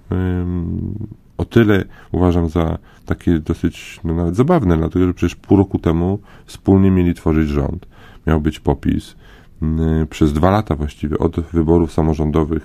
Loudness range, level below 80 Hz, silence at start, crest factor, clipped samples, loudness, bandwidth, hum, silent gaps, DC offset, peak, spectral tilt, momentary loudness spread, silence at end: 3 LU; -26 dBFS; 0.1 s; 16 dB; under 0.1%; -17 LUFS; 15.5 kHz; none; none; under 0.1%; 0 dBFS; -8.5 dB/octave; 11 LU; 0 s